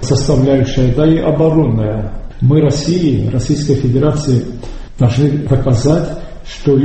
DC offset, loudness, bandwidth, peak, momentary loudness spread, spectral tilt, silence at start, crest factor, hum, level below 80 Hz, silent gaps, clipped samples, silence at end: under 0.1%; -13 LUFS; 8.6 kHz; 0 dBFS; 12 LU; -7.5 dB/octave; 0 s; 12 dB; none; -26 dBFS; none; under 0.1%; 0 s